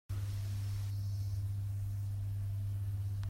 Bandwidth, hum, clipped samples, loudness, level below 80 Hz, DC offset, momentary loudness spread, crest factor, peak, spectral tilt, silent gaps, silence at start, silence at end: 16 kHz; none; under 0.1%; -39 LUFS; -50 dBFS; under 0.1%; 1 LU; 8 dB; -30 dBFS; -6.5 dB/octave; none; 0.1 s; 0 s